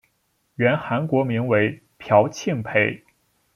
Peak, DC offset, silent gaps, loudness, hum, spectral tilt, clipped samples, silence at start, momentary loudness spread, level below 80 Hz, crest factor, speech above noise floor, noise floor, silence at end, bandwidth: -2 dBFS; under 0.1%; none; -21 LUFS; none; -6.5 dB/octave; under 0.1%; 0.6 s; 12 LU; -62 dBFS; 20 dB; 48 dB; -69 dBFS; 0.6 s; 12.5 kHz